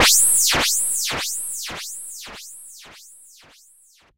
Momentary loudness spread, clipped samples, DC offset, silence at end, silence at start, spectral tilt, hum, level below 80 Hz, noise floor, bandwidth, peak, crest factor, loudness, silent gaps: 24 LU; under 0.1%; under 0.1%; 1.05 s; 0 s; 0.5 dB/octave; none; -48 dBFS; -55 dBFS; 16 kHz; -6 dBFS; 18 dB; -18 LUFS; none